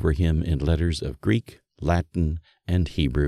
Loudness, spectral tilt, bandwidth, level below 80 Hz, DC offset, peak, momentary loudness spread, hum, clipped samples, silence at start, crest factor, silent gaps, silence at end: -25 LUFS; -7.5 dB/octave; 11.5 kHz; -30 dBFS; under 0.1%; -6 dBFS; 5 LU; none; under 0.1%; 0 s; 16 dB; none; 0 s